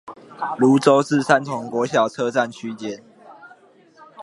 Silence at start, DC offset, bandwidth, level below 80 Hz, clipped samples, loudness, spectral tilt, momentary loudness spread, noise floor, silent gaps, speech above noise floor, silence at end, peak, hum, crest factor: 0.05 s; under 0.1%; 11.5 kHz; -68 dBFS; under 0.1%; -19 LUFS; -5.5 dB/octave; 16 LU; -51 dBFS; none; 32 dB; 0 s; 0 dBFS; none; 20 dB